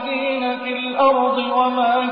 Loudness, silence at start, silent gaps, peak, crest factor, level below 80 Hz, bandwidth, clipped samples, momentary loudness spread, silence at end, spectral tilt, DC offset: -19 LUFS; 0 s; none; -4 dBFS; 14 dB; -62 dBFS; 5.2 kHz; under 0.1%; 7 LU; 0 s; -8 dB/octave; under 0.1%